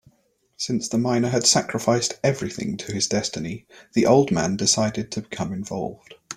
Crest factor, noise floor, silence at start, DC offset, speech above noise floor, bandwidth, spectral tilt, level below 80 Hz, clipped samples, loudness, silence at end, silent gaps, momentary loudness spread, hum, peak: 20 dB; -65 dBFS; 0.6 s; under 0.1%; 42 dB; 15.5 kHz; -4 dB/octave; -56 dBFS; under 0.1%; -22 LUFS; 0 s; none; 13 LU; none; -4 dBFS